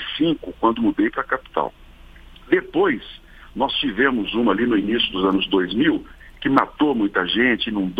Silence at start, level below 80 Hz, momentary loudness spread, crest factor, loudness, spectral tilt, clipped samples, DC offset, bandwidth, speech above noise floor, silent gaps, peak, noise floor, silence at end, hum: 0 s; -46 dBFS; 8 LU; 20 dB; -20 LUFS; -7 dB/octave; under 0.1%; under 0.1%; 5.2 kHz; 23 dB; none; 0 dBFS; -43 dBFS; 0 s; none